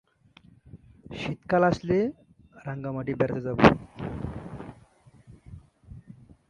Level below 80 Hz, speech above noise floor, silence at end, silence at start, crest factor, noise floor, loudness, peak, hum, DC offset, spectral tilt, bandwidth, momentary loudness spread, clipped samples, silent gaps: -50 dBFS; 33 dB; 0.35 s; 0.75 s; 28 dB; -57 dBFS; -26 LUFS; -2 dBFS; none; under 0.1%; -7.5 dB/octave; 10.5 kHz; 25 LU; under 0.1%; none